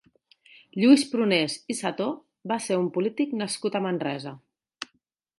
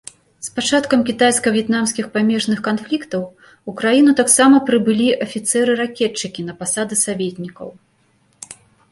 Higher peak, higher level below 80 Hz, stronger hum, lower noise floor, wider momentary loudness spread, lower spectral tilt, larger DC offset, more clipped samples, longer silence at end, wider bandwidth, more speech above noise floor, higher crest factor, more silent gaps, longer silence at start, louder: second, -6 dBFS vs 0 dBFS; second, -78 dBFS vs -60 dBFS; neither; first, -72 dBFS vs -59 dBFS; about the same, 21 LU vs 20 LU; about the same, -4.5 dB/octave vs -3.5 dB/octave; neither; neither; first, 0.55 s vs 0.4 s; about the same, 11.5 kHz vs 12 kHz; first, 47 dB vs 42 dB; about the same, 20 dB vs 16 dB; neither; first, 0.75 s vs 0.4 s; second, -25 LUFS vs -16 LUFS